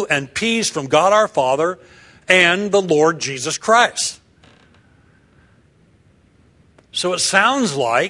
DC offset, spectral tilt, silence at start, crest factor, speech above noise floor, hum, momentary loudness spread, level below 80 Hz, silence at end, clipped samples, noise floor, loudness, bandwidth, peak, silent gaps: under 0.1%; -2.5 dB/octave; 0 s; 18 dB; 37 dB; none; 9 LU; -60 dBFS; 0 s; under 0.1%; -54 dBFS; -16 LUFS; 12 kHz; 0 dBFS; none